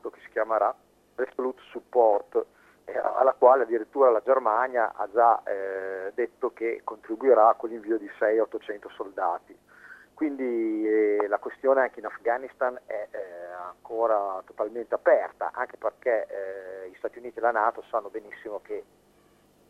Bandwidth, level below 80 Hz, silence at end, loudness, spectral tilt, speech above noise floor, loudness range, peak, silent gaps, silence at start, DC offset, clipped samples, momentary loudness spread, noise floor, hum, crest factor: 6.2 kHz; -74 dBFS; 0.9 s; -26 LUFS; -6 dB/octave; 35 dB; 7 LU; -6 dBFS; none; 0.05 s; under 0.1%; under 0.1%; 16 LU; -61 dBFS; 50 Hz at -75 dBFS; 22 dB